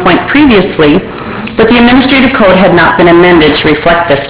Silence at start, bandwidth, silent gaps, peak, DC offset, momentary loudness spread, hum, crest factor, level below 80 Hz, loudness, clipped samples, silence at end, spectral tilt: 0 s; 4 kHz; none; 0 dBFS; under 0.1%; 6 LU; none; 6 dB; -28 dBFS; -5 LUFS; 6%; 0 s; -9.5 dB/octave